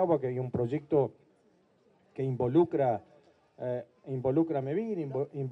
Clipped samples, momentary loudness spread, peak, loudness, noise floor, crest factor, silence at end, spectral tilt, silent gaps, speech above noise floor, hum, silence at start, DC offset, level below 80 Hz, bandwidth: under 0.1%; 11 LU; -14 dBFS; -31 LUFS; -67 dBFS; 18 dB; 0 s; -10.5 dB/octave; none; 37 dB; none; 0 s; under 0.1%; -68 dBFS; 4.2 kHz